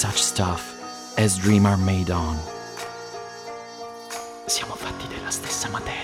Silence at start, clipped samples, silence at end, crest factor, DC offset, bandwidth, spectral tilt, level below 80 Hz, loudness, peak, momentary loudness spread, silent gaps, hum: 0 s; under 0.1%; 0 s; 18 dB; under 0.1%; 16.5 kHz; -4 dB/octave; -42 dBFS; -24 LUFS; -6 dBFS; 18 LU; none; none